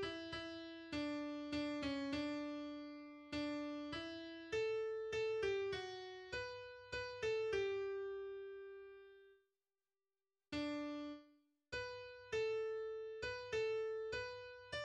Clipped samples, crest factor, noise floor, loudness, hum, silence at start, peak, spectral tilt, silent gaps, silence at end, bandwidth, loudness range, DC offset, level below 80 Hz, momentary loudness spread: under 0.1%; 16 dB; under -90 dBFS; -45 LUFS; none; 0 s; -30 dBFS; -4.5 dB/octave; none; 0 s; 9.8 kHz; 7 LU; under 0.1%; -70 dBFS; 12 LU